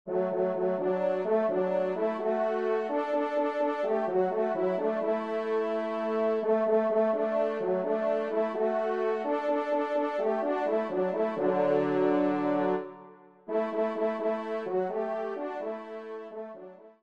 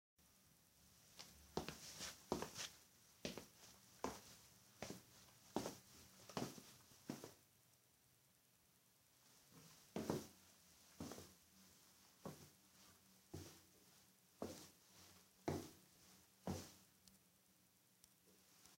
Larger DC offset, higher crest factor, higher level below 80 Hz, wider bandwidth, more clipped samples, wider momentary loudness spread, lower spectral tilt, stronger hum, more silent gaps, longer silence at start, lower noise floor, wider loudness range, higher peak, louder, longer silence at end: neither; second, 14 dB vs 30 dB; about the same, -80 dBFS vs -78 dBFS; second, 7.4 kHz vs 16 kHz; neither; second, 8 LU vs 19 LU; first, -8 dB/octave vs -4 dB/octave; neither; neither; second, 0.05 s vs 0.2 s; second, -52 dBFS vs -76 dBFS; second, 4 LU vs 8 LU; first, -14 dBFS vs -28 dBFS; first, -29 LUFS vs -54 LUFS; first, 0.15 s vs 0 s